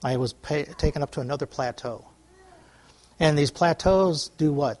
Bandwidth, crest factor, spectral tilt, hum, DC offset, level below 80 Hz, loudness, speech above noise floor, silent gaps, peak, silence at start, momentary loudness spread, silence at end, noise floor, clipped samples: 11.5 kHz; 18 dB; -6 dB/octave; none; under 0.1%; -40 dBFS; -25 LUFS; 31 dB; none; -6 dBFS; 0 s; 10 LU; 0.05 s; -55 dBFS; under 0.1%